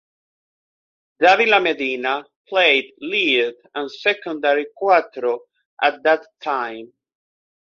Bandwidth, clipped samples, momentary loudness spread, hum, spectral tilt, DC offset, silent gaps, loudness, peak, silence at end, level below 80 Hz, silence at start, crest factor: 7.2 kHz; under 0.1%; 11 LU; none; -3 dB/octave; under 0.1%; 2.36-2.44 s, 5.66-5.77 s; -19 LUFS; -2 dBFS; 0.9 s; -70 dBFS; 1.2 s; 20 dB